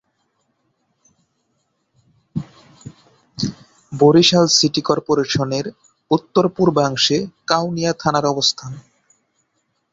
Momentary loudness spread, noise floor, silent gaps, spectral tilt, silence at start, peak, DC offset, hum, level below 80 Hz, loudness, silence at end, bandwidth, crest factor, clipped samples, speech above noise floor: 18 LU; -69 dBFS; none; -4.5 dB/octave; 2.35 s; 0 dBFS; under 0.1%; none; -56 dBFS; -17 LUFS; 1.1 s; 7.8 kHz; 20 dB; under 0.1%; 52 dB